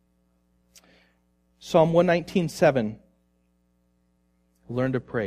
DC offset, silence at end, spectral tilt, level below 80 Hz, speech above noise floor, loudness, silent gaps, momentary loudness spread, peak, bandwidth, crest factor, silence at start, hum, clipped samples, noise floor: under 0.1%; 0 s; -6.5 dB/octave; -58 dBFS; 45 dB; -23 LUFS; none; 14 LU; -6 dBFS; 15 kHz; 20 dB; 1.65 s; 60 Hz at -55 dBFS; under 0.1%; -68 dBFS